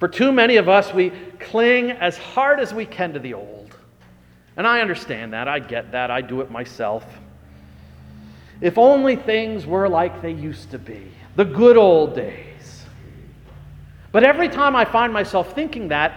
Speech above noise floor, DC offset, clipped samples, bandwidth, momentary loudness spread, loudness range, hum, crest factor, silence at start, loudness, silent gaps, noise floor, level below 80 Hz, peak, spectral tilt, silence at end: 32 dB; under 0.1%; under 0.1%; 10 kHz; 18 LU; 7 LU; none; 20 dB; 0 s; -18 LUFS; none; -50 dBFS; -50 dBFS; 0 dBFS; -6 dB/octave; 0 s